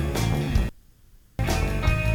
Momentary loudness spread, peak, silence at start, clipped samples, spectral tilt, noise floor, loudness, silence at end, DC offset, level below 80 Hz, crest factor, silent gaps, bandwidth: 8 LU; -8 dBFS; 0 s; under 0.1%; -5.5 dB/octave; -53 dBFS; -26 LUFS; 0 s; under 0.1%; -28 dBFS; 16 dB; none; 19 kHz